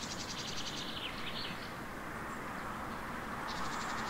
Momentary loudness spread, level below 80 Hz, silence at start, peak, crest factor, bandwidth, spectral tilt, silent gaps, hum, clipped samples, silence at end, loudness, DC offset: 4 LU; -56 dBFS; 0 s; -26 dBFS; 14 dB; 16 kHz; -3 dB/octave; none; none; under 0.1%; 0 s; -40 LUFS; under 0.1%